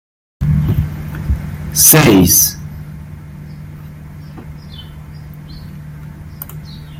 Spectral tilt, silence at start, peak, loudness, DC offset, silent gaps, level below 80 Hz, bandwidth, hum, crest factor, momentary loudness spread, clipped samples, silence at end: -4 dB/octave; 0.4 s; 0 dBFS; -11 LUFS; under 0.1%; none; -30 dBFS; 17 kHz; none; 16 dB; 25 LU; under 0.1%; 0 s